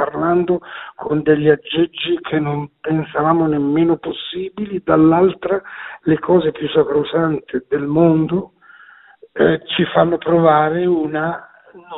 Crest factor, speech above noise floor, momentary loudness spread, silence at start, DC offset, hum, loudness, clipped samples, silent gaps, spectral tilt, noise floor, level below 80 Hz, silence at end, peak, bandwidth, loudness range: 16 dB; 29 dB; 11 LU; 0 s; under 0.1%; none; -17 LUFS; under 0.1%; none; -5.5 dB/octave; -45 dBFS; -52 dBFS; 0 s; 0 dBFS; 4.1 kHz; 2 LU